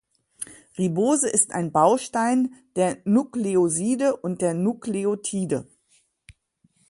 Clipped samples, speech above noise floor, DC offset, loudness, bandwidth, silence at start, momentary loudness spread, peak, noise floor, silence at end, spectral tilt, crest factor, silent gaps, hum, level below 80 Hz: under 0.1%; 43 dB; under 0.1%; -23 LUFS; 11.5 kHz; 0.4 s; 9 LU; -4 dBFS; -65 dBFS; 0.6 s; -5 dB/octave; 20 dB; none; none; -64 dBFS